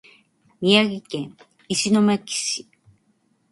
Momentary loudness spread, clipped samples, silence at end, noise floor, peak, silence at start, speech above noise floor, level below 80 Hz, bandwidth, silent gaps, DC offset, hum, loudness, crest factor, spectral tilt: 14 LU; under 0.1%; 0.9 s; -65 dBFS; -2 dBFS; 0.6 s; 44 dB; -66 dBFS; 11.5 kHz; none; under 0.1%; none; -21 LUFS; 22 dB; -3.5 dB/octave